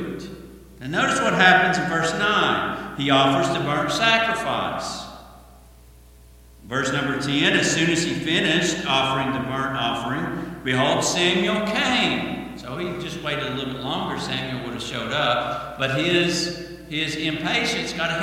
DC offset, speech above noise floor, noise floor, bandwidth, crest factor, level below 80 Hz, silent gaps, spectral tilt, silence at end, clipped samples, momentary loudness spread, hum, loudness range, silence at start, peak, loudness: under 0.1%; 26 dB; -48 dBFS; 16.5 kHz; 22 dB; -50 dBFS; none; -3.5 dB/octave; 0 s; under 0.1%; 11 LU; none; 6 LU; 0 s; 0 dBFS; -21 LUFS